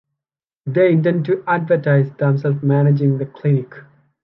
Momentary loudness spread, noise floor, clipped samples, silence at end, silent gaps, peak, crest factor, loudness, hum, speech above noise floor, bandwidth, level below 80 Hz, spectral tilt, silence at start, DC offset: 6 LU; -88 dBFS; under 0.1%; 0.4 s; none; -4 dBFS; 14 dB; -17 LUFS; none; 71 dB; 5.2 kHz; -66 dBFS; -11.5 dB/octave; 0.65 s; under 0.1%